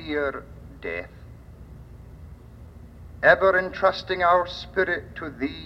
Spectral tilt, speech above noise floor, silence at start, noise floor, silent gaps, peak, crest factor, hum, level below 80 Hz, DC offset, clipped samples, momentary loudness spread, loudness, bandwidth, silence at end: -6 dB/octave; 21 dB; 0 s; -44 dBFS; none; -4 dBFS; 22 dB; none; -48 dBFS; under 0.1%; under 0.1%; 26 LU; -23 LUFS; 7.8 kHz; 0 s